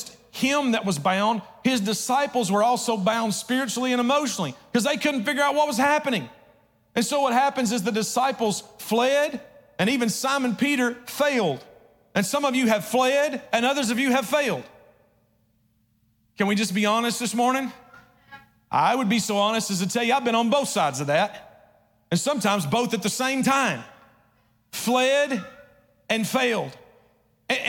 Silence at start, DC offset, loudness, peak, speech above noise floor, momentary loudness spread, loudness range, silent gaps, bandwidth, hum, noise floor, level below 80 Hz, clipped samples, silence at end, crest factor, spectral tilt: 0 s; under 0.1%; -23 LUFS; -10 dBFS; 43 dB; 7 LU; 3 LU; none; 17.5 kHz; none; -66 dBFS; -68 dBFS; under 0.1%; 0 s; 14 dB; -3.5 dB/octave